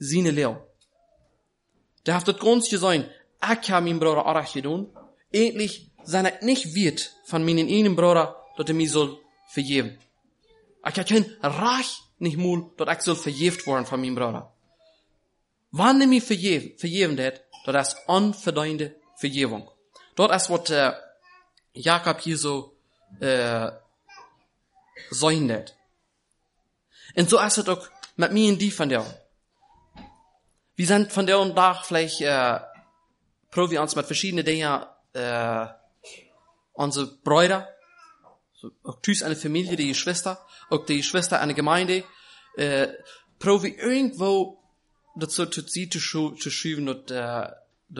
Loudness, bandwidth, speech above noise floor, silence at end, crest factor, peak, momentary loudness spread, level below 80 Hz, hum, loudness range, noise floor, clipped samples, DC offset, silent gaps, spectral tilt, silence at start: -24 LUFS; 11.5 kHz; 50 dB; 0 s; 22 dB; -4 dBFS; 12 LU; -68 dBFS; none; 5 LU; -73 dBFS; under 0.1%; under 0.1%; none; -4 dB/octave; 0 s